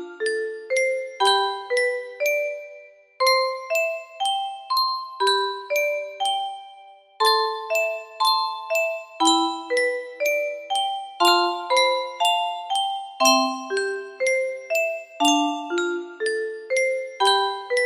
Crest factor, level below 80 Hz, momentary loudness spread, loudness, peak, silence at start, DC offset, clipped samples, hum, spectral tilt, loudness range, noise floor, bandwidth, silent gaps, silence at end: 20 dB; -76 dBFS; 8 LU; -22 LUFS; -4 dBFS; 0 s; under 0.1%; under 0.1%; none; 0.5 dB/octave; 3 LU; -47 dBFS; 15.5 kHz; none; 0 s